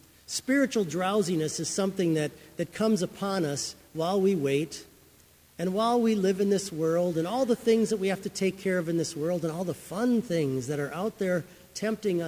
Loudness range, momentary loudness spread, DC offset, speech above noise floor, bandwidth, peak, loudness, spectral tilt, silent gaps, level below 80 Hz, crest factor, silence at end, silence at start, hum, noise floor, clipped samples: 3 LU; 9 LU; under 0.1%; 31 dB; 16 kHz; -12 dBFS; -28 LUFS; -5 dB/octave; none; -64 dBFS; 16 dB; 0 s; 0.3 s; none; -58 dBFS; under 0.1%